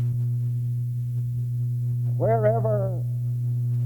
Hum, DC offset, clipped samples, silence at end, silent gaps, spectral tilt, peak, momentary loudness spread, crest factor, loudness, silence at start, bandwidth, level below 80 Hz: 60 Hz at -45 dBFS; under 0.1%; under 0.1%; 0 s; none; -10.5 dB/octave; -10 dBFS; 6 LU; 14 dB; -25 LUFS; 0 s; 2.2 kHz; -54 dBFS